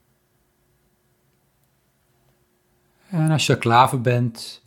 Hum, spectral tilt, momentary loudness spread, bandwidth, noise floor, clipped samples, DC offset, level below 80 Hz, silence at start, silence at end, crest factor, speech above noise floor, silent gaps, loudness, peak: none; -5.5 dB/octave; 10 LU; 17 kHz; -65 dBFS; under 0.1%; under 0.1%; -64 dBFS; 3.1 s; 0.1 s; 22 dB; 46 dB; none; -19 LUFS; -2 dBFS